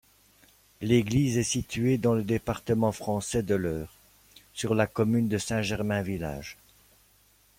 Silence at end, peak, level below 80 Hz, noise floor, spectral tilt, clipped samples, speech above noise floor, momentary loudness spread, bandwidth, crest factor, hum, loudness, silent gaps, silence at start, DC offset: 1.05 s; -10 dBFS; -52 dBFS; -62 dBFS; -5.5 dB/octave; under 0.1%; 36 dB; 11 LU; 16.5 kHz; 18 dB; none; -28 LUFS; none; 0.8 s; under 0.1%